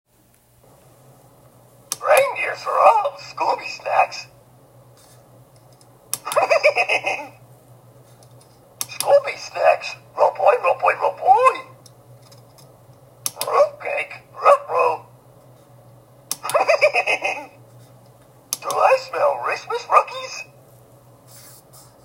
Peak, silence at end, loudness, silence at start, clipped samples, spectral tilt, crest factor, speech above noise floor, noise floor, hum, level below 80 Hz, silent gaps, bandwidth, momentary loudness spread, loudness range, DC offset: 0 dBFS; 1.6 s; -19 LUFS; 1.9 s; under 0.1%; -1.5 dB/octave; 22 dB; 38 dB; -57 dBFS; none; -68 dBFS; none; 16 kHz; 15 LU; 4 LU; under 0.1%